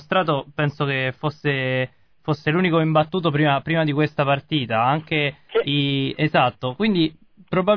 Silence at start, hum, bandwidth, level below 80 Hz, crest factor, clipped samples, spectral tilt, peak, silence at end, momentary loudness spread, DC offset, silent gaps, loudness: 0 s; none; 5.4 kHz; -56 dBFS; 16 dB; under 0.1%; -8.5 dB/octave; -4 dBFS; 0 s; 6 LU; 0.1%; none; -21 LUFS